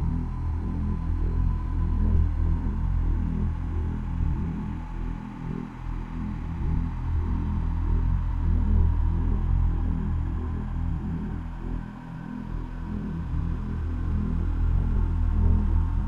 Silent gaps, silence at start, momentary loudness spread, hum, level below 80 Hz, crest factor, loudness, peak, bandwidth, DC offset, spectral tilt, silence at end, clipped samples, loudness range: none; 0 s; 10 LU; none; -28 dBFS; 14 dB; -29 LUFS; -10 dBFS; 3.6 kHz; under 0.1%; -10 dB/octave; 0 s; under 0.1%; 5 LU